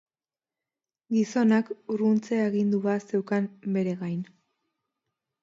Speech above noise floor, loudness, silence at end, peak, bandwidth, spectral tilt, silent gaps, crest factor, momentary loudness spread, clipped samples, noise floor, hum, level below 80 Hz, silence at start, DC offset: over 64 dB; -27 LUFS; 1.2 s; -10 dBFS; 7.6 kHz; -7.5 dB/octave; none; 18 dB; 9 LU; under 0.1%; under -90 dBFS; none; -76 dBFS; 1.1 s; under 0.1%